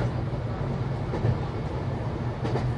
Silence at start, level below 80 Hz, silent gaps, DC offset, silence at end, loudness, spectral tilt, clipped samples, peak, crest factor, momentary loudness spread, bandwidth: 0 s; -38 dBFS; none; under 0.1%; 0 s; -30 LUFS; -8.5 dB/octave; under 0.1%; -12 dBFS; 16 dB; 4 LU; 8.6 kHz